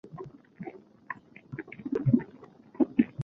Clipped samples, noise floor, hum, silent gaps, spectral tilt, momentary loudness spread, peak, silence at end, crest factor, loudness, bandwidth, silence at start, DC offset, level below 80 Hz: under 0.1%; -53 dBFS; none; none; -10.5 dB/octave; 20 LU; -8 dBFS; 0 s; 24 dB; -29 LUFS; 3.9 kHz; 0.05 s; under 0.1%; -64 dBFS